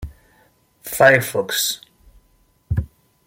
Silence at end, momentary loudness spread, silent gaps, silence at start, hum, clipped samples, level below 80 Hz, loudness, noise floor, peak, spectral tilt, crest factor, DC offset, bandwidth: 0.4 s; 24 LU; none; 0 s; none; under 0.1%; -40 dBFS; -18 LUFS; -59 dBFS; -2 dBFS; -3 dB/octave; 20 dB; under 0.1%; 16.5 kHz